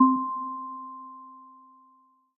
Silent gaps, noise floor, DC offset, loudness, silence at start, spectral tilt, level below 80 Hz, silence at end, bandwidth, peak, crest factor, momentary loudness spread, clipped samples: none; -62 dBFS; under 0.1%; -30 LUFS; 0 s; -11 dB/octave; under -90 dBFS; 0.9 s; 1.2 kHz; -8 dBFS; 22 dB; 23 LU; under 0.1%